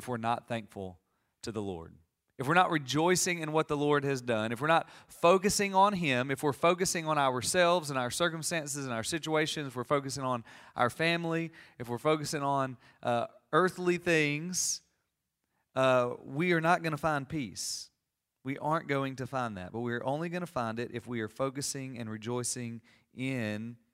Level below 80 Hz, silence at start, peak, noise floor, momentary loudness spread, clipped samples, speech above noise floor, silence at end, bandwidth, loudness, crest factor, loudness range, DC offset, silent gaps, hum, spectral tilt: -66 dBFS; 0 s; -8 dBFS; -85 dBFS; 12 LU; under 0.1%; 54 dB; 0.2 s; 16 kHz; -31 LUFS; 22 dB; 7 LU; under 0.1%; none; none; -4 dB/octave